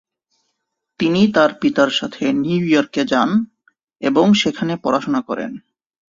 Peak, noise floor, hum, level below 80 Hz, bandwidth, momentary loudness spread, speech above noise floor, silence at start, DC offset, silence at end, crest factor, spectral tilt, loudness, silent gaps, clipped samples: -2 dBFS; -75 dBFS; none; -56 dBFS; 7.6 kHz; 11 LU; 58 dB; 1 s; under 0.1%; 0.55 s; 16 dB; -5.5 dB/octave; -17 LUFS; none; under 0.1%